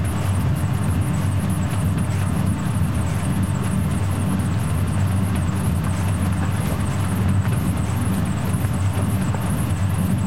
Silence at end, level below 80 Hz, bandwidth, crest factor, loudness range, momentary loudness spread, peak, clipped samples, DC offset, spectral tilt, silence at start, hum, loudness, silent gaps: 0 s; -36 dBFS; 16 kHz; 12 dB; 0 LU; 1 LU; -8 dBFS; under 0.1%; 2%; -6.5 dB/octave; 0 s; none; -22 LUFS; none